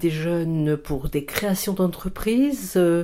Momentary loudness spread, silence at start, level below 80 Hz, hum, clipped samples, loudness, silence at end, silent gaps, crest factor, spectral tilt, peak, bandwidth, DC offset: 6 LU; 0 s; -40 dBFS; none; under 0.1%; -23 LUFS; 0 s; none; 18 dB; -6 dB/octave; -4 dBFS; 16.5 kHz; under 0.1%